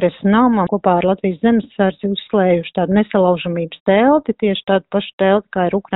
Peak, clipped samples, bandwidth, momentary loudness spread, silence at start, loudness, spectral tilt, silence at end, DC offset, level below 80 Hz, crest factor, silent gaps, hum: -2 dBFS; under 0.1%; 4 kHz; 6 LU; 0 s; -16 LUFS; -5.5 dB/octave; 0 s; under 0.1%; -50 dBFS; 14 dB; 3.80-3.86 s, 5.13-5.18 s; none